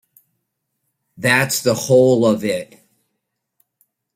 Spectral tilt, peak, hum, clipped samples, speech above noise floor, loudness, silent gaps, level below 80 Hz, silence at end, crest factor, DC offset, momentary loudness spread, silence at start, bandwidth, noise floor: -4.5 dB/octave; 0 dBFS; none; under 0.1%; 60 dB; -16 LUFS; none; -60 dBFS; 1.5 s; 20 dB; under 0.1%; 10 LU; 1.2 s; 16 kHz; -76 dBFS